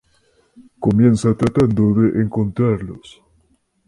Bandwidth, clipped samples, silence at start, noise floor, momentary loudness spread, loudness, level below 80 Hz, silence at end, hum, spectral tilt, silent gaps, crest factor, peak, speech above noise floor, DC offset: 11.5 kHz; under 0.1%; 0.6 s; -61 dBFS; 10 LU; -17 LUFS; -42 dBFS; 0.9 s; none; -8.5 dB/octave; none; 16 dB; -2 dBFS; 45 dB; under 0.1%